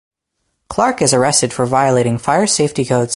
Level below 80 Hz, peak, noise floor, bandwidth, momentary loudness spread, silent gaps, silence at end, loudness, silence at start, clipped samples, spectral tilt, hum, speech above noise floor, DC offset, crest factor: -48 dBFS; 0 dBFS; -71 dBFS; 11.5 kHz; 4 LU; none; 0 s; -14 LUFS; 0.7 s; under 0.1%; -4 dB/octave; none; 56 dB; under 0.1%; 16 dB